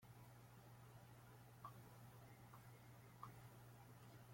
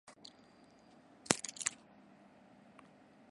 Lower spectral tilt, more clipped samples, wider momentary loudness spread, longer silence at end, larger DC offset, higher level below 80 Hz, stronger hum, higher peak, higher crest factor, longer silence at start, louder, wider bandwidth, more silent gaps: first, -5.5 dB/octave vs -1.5 dB/octave; neither; second, 4 LU vs 27 LU; second, 0 s vs 1.55 s; neither; about the same, -80 dBFS vs -78 dBFS; first, 60 Hz at -65 dBFS vs none; second, -42 dBFS vs -4 dBFS; second, 20 dB vs 42 dB; about the same, 0 s vs 0.1 s; second, -63 LUFS vs -37 LUFS; first, 16.5 kHz vs 11.5 kHz; neither